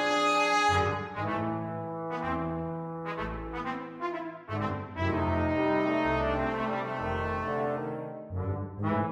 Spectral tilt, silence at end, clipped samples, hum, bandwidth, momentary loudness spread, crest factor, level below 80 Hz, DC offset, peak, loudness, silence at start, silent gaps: -6 dB/octave; 0 s; under 0.1%; none; 12.5 kHz; 11 LU; 16 dB; -48 dBFS; under 0.1%; -14 dBFS; -31 LUFS; 0 s; none